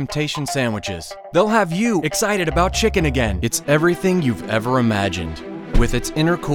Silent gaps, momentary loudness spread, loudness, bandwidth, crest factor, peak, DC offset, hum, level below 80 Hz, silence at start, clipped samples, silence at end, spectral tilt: none; 8 LU; -19 LUFS; 19 kHz; 16 dB; -2 dBFS; under 0.1%; none; -28 dBFS; 0 s; under 0.1%; 0 s; -5 dB/octave